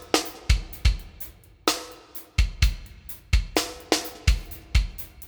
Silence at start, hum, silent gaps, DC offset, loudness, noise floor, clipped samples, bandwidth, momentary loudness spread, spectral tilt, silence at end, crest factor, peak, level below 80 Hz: 0 s; none; none; under 0.1%; -27 LUFS; -43 dBFS; under 0.1%; over 20 kHz; 15 LU; -4 dB/octave; 0 s; 24 dB; -2 dBFS; -28 dBFS